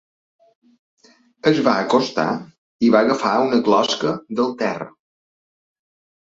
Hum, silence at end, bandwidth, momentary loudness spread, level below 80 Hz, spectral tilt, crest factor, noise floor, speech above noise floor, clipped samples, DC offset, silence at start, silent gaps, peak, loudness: none; 1.45 s; 7.8 kHz; 8 LU; -64 dBFS; -5 dB/octave; 18 dB; under -90 dBFS; over 72 dB; under 0.1%; under 0.1%; 1.45 s; 2.58-2.79 s; -2 dBFS; -19 LUFS